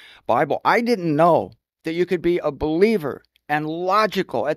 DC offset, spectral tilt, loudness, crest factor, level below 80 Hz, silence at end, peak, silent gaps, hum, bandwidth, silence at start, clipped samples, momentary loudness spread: under 0.1%; -6.5 dB/octave; -20 LUFS; 18 dB; -50 dBFS; 0 s; -2 dBFS; none; none; 14.5 kHz; 0.3 s; under 0.1%; 11 LU